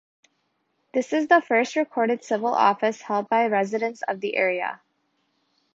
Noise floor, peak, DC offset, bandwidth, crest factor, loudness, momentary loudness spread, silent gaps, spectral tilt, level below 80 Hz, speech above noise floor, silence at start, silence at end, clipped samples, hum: -72 dBFS; -4 dBFS; under 0.1%; 7.8 kHz; 20 dB; -23 LUFS; 9 LU; none; -4.5 dB/octave; -76 dBFS; 50 dB; 0.95 s; 1 s; under 0.1%; none